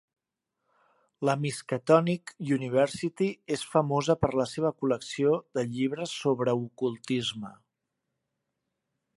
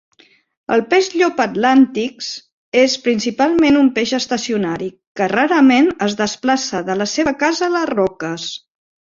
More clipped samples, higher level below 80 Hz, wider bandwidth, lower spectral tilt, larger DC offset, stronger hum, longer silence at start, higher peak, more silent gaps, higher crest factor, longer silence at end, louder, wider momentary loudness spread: neither; second, -62 dBFS vs -54 dBFS; first, 11.5 kHz vs 7.6 kHz; first, -6 dB/octave vs -4 dB/octave; neither; neither; first, 1.2 s vs 0.7 s; second, -8 dBFS vs -2 dBFS; second, none vs 2.52-2.72 s, 5.07-5.15 s; first, 22 dB vs 16 dB; first, 1.65 s vs 0.6 s; second, -28 LUFS vs -16 LUFS; second, 9 LU vs 13 LU